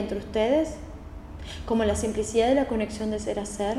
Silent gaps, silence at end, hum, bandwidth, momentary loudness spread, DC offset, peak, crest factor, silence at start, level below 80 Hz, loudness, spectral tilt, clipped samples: none; 0 s; none; 13.5 kHz; 18 LU; under 0.1%; -10 dBFS; 16 dB; 0 s; -42 dBFS; -26 LUFS; -5 dB/octave; under 0.1%